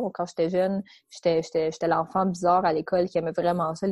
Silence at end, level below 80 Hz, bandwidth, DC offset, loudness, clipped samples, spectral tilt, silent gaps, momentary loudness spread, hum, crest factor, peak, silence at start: 0 s; -60 dBFS; 12 kHz; under 0.1%; -25 LUFS; under 0.1%; -6.5 dB/octave; none; 6 LU; none; 16 dB; -10 dBFS; 0 s